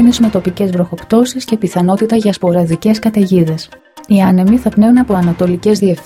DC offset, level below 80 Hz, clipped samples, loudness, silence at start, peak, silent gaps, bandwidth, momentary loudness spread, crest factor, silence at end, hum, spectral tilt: under 0.1%; -40 dBFS; under 0.1%; -12 LUFS; 0 s; 0 dBFS; none; 15.5 kHz; 6 LU; 12 dB; 0.05 s; none; -7 dB/octave